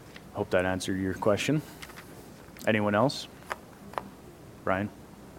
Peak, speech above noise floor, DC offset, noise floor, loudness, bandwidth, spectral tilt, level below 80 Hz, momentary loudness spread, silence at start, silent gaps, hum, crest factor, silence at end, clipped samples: -10 dBFS; 21 dB; under 0.1%; -49 dBFS; -30 LUFS; 17 kHz; -5.5 dB/octave; -60 dBFS; 22 LU; 0 s; none; none; 22 dB; 0 s; under 0.1%